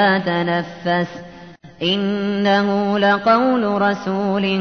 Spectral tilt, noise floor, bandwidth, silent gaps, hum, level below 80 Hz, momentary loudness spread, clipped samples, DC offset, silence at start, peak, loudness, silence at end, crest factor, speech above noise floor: -6.5 dB/octave; -40 dBFS; 6.6 kHz; none; none; -56 dBFS; 7 LU; under 0.1%; 0.2%; 0 s; -4 dBFS; -18 LUFS; 0 s; 14 dB; 22 dB